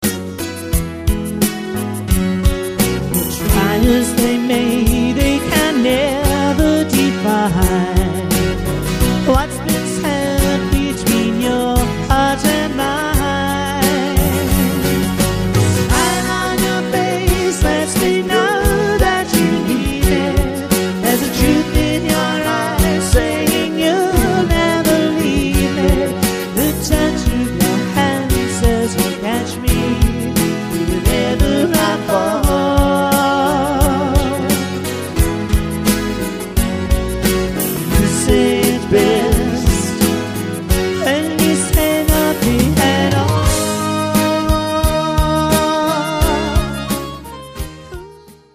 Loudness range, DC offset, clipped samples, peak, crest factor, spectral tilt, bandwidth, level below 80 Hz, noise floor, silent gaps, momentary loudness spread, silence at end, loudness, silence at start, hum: 2 LU; under 0.1%; under 0.1%; 0 dBFS; 14 dB; -5 dB/octave; 15.5 kHz; -22 dBFS; -40 dBFS; none; 5 LU; 0.25 s; -15 LUFS; 0 s; none